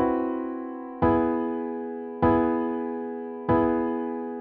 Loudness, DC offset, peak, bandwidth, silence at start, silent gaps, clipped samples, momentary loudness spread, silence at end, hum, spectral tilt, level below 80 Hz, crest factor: -26 LUFS; under 0.1%; -10 dBFS; 4.3 kHz; 0 s; none; under 0.1%; 11 LU; 0 s; none; -7.5 dB/octave; -48 dBFS; 16 dB